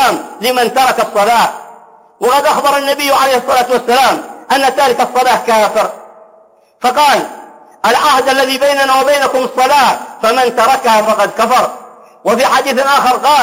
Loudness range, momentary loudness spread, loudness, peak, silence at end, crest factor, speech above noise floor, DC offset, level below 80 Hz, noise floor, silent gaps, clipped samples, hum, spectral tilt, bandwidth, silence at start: 2 LU; 6 LU; -11 LUFS; 0 dBFS; 0 s; 10 dB; 35 dB; under 0.1%; -54 dBFS; -46 dBFS; none; under 0.1%; none; -2 dB/octave; 16.5 kHz; 0 s